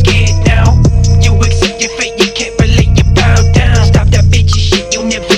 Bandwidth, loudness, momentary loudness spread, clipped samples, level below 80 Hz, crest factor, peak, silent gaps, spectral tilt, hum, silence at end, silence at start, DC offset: 10 kHz; -9 LUFS; 4 LU; under 0.1%; -14 dBFS; 8 dB; 0 dBFS; none; -5 dB/octave; none; 0 s; 0 s; under 0.1%